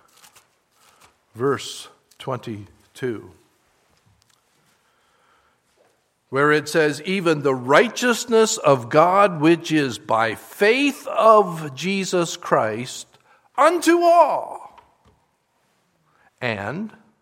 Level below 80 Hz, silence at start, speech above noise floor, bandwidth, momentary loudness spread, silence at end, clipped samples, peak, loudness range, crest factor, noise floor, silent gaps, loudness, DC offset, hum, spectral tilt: -70 dBFS; 1.35 s; 48 dB; 16 kHz; 17 LU; 0.3 s; under 0.1%; 0 dBFS; 17 LU; 22 dB; -66 dBFS; none; -19 LUFS; under 0.1%; none; -4.5 dB/octave